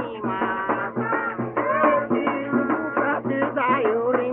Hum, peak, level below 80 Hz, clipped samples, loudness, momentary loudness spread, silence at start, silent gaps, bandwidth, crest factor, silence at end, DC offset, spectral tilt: none; -6 dBFS; -62 dBFS; under 0.1%; -23 LUFS; 5 LU; 0 s; none; 3.8 kHz; 16 dB; 0 s; under 0.1%; -5 dB/octave